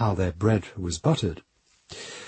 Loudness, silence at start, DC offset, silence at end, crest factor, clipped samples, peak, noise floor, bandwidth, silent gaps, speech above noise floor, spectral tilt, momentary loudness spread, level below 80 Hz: -26 LUFS; 0 s; under 0.1%; 0 s; 18 dB; under 0.1%; -8 dBFS; -48 dBFS; 8.8 kHz; none; 23 dB; -6 dB/octave; 17 LU; -46 dBFS